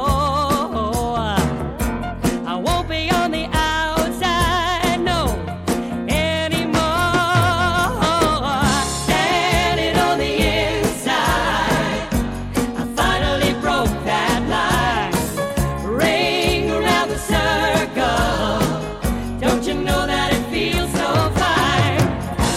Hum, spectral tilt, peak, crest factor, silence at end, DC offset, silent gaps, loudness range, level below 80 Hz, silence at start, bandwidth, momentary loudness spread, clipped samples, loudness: none; -4.5 dB/octave; -4 dBFS; 16 dB; 0 s; under 0.1%; none; 2 LU; -30 dBFS; 0 s; 16.5 kHz; 6 LU; under 0.1%; -19 LUFS